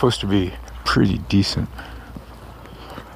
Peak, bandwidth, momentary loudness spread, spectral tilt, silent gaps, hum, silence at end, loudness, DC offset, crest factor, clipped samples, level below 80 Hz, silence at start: -4 dBFS; 15.5 kHz; 21 LU; -6 dB/octave; none; none; 0 s; -21 LUFS; under 0.1%; 18 dB; under 0.1%; -36 dBFS; 0 s